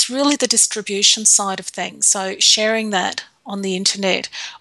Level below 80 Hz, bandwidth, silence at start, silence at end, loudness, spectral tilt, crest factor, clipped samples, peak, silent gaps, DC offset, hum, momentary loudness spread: -70 dBFS; 14.5 kHz; 0 s; 0.05 s; -15 LUFS; -1 dB/octave; 18 dB; under 0.1%; 0 dBFS; none; under 0.1%; none; 14 LU